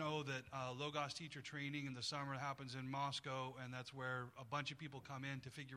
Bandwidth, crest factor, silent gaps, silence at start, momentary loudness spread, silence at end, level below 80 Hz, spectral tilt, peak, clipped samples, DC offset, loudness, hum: 14 kHz; 20 dB; none; 0 s; 6 LU; 0 s; -80 dBFS; -4.5 dB/octave; -28 dBFS; under 0.1%; under 0.1%; -47 LUFS; none